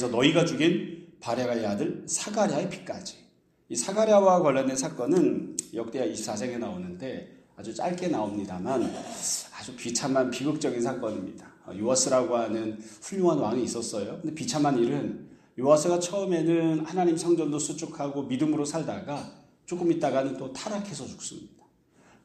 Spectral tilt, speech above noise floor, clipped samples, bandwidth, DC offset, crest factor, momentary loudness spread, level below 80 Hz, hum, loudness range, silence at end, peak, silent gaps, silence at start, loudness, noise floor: -4.5 dB/octave; 33 dB; under 0.1%; 13.5 kHz; under 0.1%; 20 dB; 15 LU; -68 dBFS; none; 6 LU; 0.75 s; -6 dBFS; none; 0 s; -27 LUFS; -60 dBFS